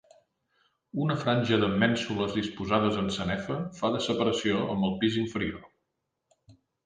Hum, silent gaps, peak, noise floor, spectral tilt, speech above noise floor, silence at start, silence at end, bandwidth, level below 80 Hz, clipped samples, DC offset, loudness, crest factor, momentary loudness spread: none; none; -10 dBFS; -81 dBFS; -6 dB/octave; 54 dB; 0.95 s; 0.35 s; 9.6 kHz; -56 dBFS; under 0.1%; under 0.1%; -28 LUFS; 20 dB; 7 LU